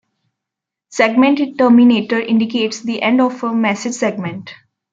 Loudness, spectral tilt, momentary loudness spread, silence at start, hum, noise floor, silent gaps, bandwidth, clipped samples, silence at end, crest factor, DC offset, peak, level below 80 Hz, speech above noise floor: -15 LUFS; -5 dB/octave; 11 LU; 0.9 s; none; -83 dBFS; none; 7.8 kHz; under 0.1%; 0.4 s; 16 dB; under 0.1%; 0 dBFS; -64 dBFS; 69 dB